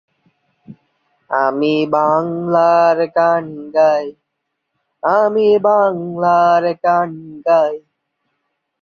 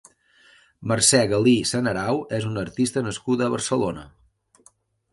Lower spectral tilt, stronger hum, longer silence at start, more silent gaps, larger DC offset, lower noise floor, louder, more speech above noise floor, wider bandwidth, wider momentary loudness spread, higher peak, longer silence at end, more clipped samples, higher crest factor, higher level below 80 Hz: first, -7 dB/octave vs -4 dB/octave; neither; about the same, 0.7 s vs 0.8 s; neither; neither; first, -75 dBFS vs -59 dBFS; first, -15 LUFS vs -22 LUFS; first, 60 dB vs 37 dB; second, 6.8 kHz vs 11.5 kHz; about the same, 9 LU vs 11 LU; about the same, -2 dBFS vs -4 dBFS; about the same, 1.05 s vs 1.05 s; neither; second, 14 dB vs 20 dB; second, -64 dBFS vs -54 dBFS